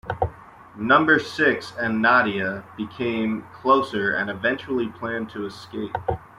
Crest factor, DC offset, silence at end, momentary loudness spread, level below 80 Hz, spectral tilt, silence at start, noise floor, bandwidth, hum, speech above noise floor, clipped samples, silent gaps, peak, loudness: 20 dB; under 0.1%; 0.15 s; 14 LU; -52 dBFS; -6 dB/octave; 0.05 s; -43 dBFS; 13 kHz; none; 20 dB; under 0.1%; none; -4 dBFS; -22 LUFS